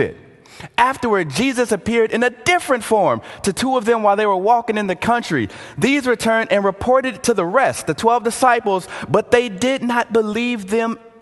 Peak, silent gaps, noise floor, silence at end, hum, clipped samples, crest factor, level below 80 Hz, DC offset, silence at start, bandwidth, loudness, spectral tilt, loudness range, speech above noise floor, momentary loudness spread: 0 dBFS; none; -38 dBFS; 0.15 s; none; under 0.1%; 18 dB; -48 dBFS; under 0.1%; 0 s; 12.5 kHz; -18 LUFS; -4.5 dB/octave; 1 LU; 21 dB; 6 LU